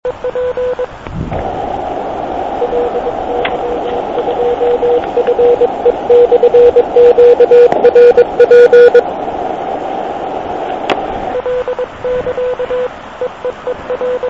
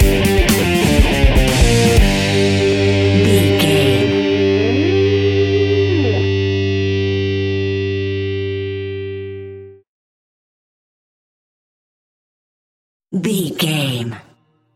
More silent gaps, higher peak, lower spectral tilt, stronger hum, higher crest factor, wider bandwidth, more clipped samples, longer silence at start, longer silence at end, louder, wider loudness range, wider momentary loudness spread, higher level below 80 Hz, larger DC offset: second, none vs 9.88-13.00 s; about the same, 0 dBFS vs 0 dBFS; about the same, -6.5 dB/octave vs -5.5 dB/octave; neither; second, 10 dB vs 16 dB; second, 7 kHz vs 17 kHz; first, 1% vs under 0.1%; about the same, 0.05 s vs 0 s; second, 0 s vs 0.55 s; first, -11 LUFS vs -15 LUFS; second, 11 LU vs 15 LU; about the same, 14 LU vs 12 LU; second, -38 dBFS vs -24 dBFS; first, 0.4% vs under 0.1%